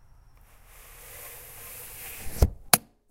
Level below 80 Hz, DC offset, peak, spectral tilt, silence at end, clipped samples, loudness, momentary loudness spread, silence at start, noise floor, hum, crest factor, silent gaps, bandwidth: -36 dBFS; under 0.1%; 0 dBFS; -3 dB/octave; 0.3 s; under 0.1%; -26 LUFS; 21 LU; 0.75 s; -54 dBFS; none; 30 dB; none; 16 kHz